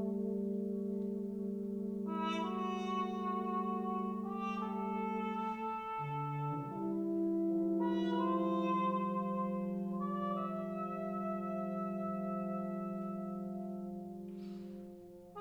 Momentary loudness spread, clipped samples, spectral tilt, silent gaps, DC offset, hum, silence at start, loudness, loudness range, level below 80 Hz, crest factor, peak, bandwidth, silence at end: 9 LU; under 0.1%; -8.5 dB/octave; none; under 0.1%; none; 0 s; -38 LUFS; 5 LU; -74 dBFS; 14 dB; -24 dBFS; 7 kHz; 0 s